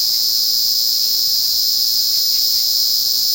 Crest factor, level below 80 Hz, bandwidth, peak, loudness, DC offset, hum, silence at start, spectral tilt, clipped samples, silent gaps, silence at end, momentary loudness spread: 14 dB; -62 dBFS; 16.5 kHz; -2 dBFS; -13 LUFS; under 0.1%; none; 0 s; 2.5 dB/octave; under 0.1%; none; 0 s; 1 LU